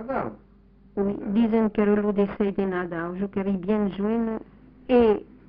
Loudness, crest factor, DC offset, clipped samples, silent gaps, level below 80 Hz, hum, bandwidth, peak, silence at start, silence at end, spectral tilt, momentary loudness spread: -24 LUFS; 16 dB; under 0.1%; under 0.1%; none; -50 dBFS; none; 4.9 kHz; -8 dBFS; 0 s; 0.25 s; -7 dB/octave; 10 LU